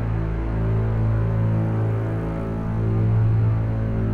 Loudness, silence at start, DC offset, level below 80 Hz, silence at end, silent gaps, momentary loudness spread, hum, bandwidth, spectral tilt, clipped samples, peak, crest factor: -23 LUFS; 0 s; under 0.1%; -30 dBFS; 0 s; none; 6 LU; none; 3.3 kHz; -10.5 dB/octave; under 0.1%; -12 dBFS; 10 dB